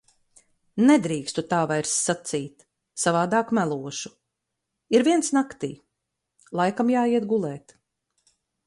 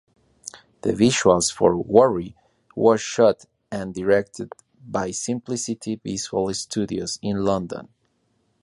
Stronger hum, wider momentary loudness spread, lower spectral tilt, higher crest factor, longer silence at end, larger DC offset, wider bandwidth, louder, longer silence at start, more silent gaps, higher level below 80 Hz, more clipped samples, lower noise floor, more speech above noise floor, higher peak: neither; second, 15 LU vs 19 LU; about the same, -4.5 dB/octave vs -4.5 dB/octave; about the same, 18 dB vs 22 dB; first, 1.1 s vs 0.8 s; neither; about the same, 11.5 kHz vs 11.5 kHz; about the same, -24 LUFS vs -22 LUFS; first, 0.75 s vs 0.45 s; neither; second, -68 dBFS vs -52 dBFS; neither; first, -82 dBFS vs -68 dBFS; first, 59 dB vs 47 dB; second, -6 dBFS vs 0 dBFS